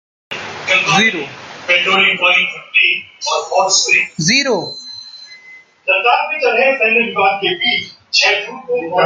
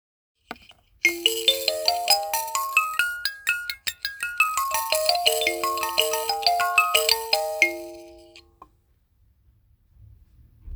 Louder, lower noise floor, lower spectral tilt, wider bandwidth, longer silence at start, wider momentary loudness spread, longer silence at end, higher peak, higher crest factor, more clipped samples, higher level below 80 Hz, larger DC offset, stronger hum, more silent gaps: first, -13 LUFS vs -22 LUFS; second, -42 dBFS vs -64 dBFS; first, -1.5 dB/octave vs 0.5 dB/octave; second, 10 kHz vs over 20 kHz; second, 0.3 s vs 0.5 s; first, 16 LU vs 10 LU; about the same, 0 s vs 0 s; about the same, 0 dBFS vs -2 dBFS; second, 16 dB vs 24 dB; neither; second, -62 dBFS vs -56 dBFS; neither; neither; neither